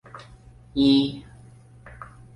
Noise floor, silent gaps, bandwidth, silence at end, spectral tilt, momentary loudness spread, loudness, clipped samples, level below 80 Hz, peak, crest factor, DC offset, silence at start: -49 dBFS; none; 10.5 kHz; 0.3 s; -6.5 dB/octave; 25 LU; -22 LUFS; under 0.1%; -52 dBFS; -8 dBFS; 18 dB; under 0.1%; 0.15 s